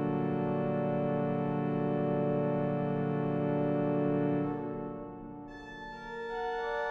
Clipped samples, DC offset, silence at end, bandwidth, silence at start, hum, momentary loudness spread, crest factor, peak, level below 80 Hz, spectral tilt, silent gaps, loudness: under 0.1%; under 0.1%; 0 s; 6.4 kHz; 0 s; none; 13 LU; 14 dB; -18 dBFS; -58 dBFS; -9.5 dB/octave; none; -32 LUFS